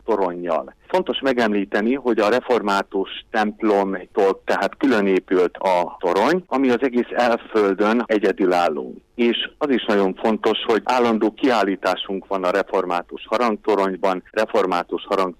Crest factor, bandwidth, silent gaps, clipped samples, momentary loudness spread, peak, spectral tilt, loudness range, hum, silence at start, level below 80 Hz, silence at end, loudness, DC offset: 14 dB; 15.5 kHz; none; under 0.1%; 5 LU; -6 dBFS; -5.5 dB/octave; 2 LU; none; 0.05 s; -56 dBFS; 0.05 s; -20 LUFS; under 0.1%